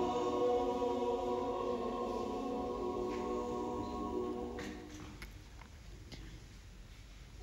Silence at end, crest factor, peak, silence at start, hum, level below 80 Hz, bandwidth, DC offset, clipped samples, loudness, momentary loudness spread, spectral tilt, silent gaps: 0 s; 16 dB; -24 dBFS; 0 s; none; -54 dBFS; 15.5 kHz; under 0.1%; under 0.1%; -38 LUFS; 20 LU; -6 dB/octave; none